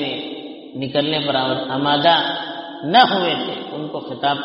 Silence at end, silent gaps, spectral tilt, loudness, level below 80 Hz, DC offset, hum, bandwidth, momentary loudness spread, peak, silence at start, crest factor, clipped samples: 0 s; none; -2 dB/octave; -19 LUFS; -62 dBFS; under 0.1%; none; 5.8 kHz; 15 LU; 0 dBFS; 0 s; 20 dB; under 0.1%